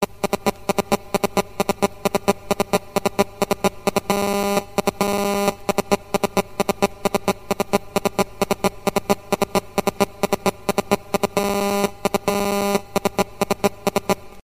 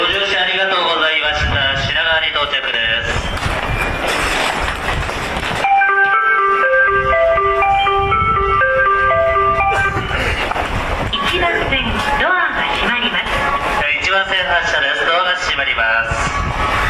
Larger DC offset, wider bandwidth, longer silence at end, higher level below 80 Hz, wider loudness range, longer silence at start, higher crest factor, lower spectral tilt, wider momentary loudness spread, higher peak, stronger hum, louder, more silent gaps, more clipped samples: first, 0.7% vs under 0.1%; first, 15.5 kHz vs 14 kHz; first, 0.15 s vs 0 s; second, -46 dBFS vs -30 dBFS; about the same, 1 LU vs 3 LU; about the same, 0 s vs 0 s; first, 22 dB vs 12 dB; about the same, -4.5 dB/octave vs -3.5 dB/octave; second, 3 LU vs 6 LU; first, 0 dBFS vs -4 dBFS; neither; second, -22 LUFS vs -15 LUFS; neither; neither